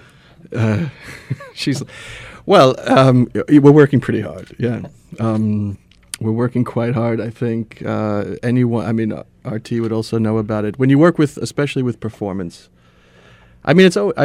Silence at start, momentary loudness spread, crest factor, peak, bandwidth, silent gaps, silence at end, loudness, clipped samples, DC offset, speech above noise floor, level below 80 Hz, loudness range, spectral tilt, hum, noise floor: 0.5 s; 17 LU; 16 dB; 0 dBFS; 14 kHz; none; 0 s; -16 LUFS; under 0.1%; under 0.1%; 33 dB; -50 dBFS; 7 LU; -7 dB/octave; none; -49 dBFS